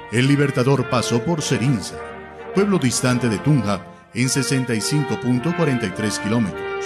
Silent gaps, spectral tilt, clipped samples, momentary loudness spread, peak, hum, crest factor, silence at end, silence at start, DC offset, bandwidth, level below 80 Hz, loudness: none; -5 dB/octave; under 0.1%; 7 LU; -4 dBFS; none; 16 dB; 0 s; 0 s; under 0.1%; 14 kHz; -50 dBFS; -20 LUFS